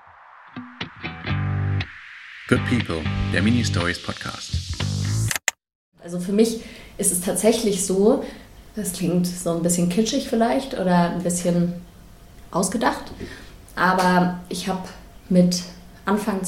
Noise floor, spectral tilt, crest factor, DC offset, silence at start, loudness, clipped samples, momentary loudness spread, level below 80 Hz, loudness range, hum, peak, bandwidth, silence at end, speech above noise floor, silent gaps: -47 dBFS; -5 dB/octave; 22 dB; under 0.1%; 0.35 s; -22 LUFS; under 0.1%; 17 LU; -44 dBFS; 3 LU; none; 0 dBFS; 16.5 kHz; 0 s; 26 dB; 5.75-5.92 s